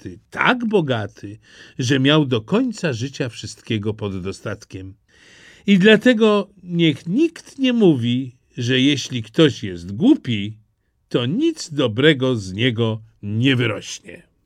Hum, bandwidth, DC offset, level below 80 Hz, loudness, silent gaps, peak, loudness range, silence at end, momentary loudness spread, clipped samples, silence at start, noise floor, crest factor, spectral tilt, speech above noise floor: none; 11.5 kHz; under 0.1%; -58 dBFS; -19 LUFS; none; 0 dBFS; 4 LU; 0.3 s; 15 LU; under 0.1%; 0.05 s; -63 dBFS; 18 dB; -6 dB/octave; 45 dB